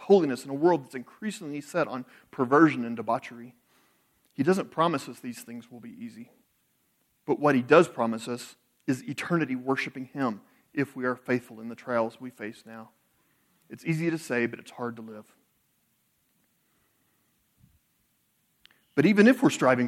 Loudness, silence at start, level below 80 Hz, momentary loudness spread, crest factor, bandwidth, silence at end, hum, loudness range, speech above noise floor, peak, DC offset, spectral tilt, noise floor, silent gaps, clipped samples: -27 LUFS; 0 s; -76 dBFS; 22 LU; 22 dB; 15.5 kHz; 0 s; none; 8 LU; 45 dB; -6 dBFS; under 0.1%; -6 dB/octave; -72 dBFS; none; under 0.1%